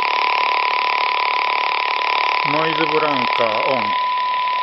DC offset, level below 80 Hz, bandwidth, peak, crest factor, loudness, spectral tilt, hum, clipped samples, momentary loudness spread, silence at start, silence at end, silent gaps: under 0.1%; -68 dBFS; 6 kHz; -2 dBFS; 16 dB; -17 LUFS; 0 dB/octave; none; under 0.1%; 2 LU; 0 s; 0 s; none